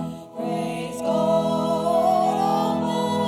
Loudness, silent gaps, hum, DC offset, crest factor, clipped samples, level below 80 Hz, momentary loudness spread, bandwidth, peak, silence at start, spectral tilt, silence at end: -22 LUFS; none; none; under 0.1%; 12 dB; under 0.1%; -58 dBFS; 9 LU; 15.5 kHz; -10 dBFS; 0 s; -6 dB/octave; 0 s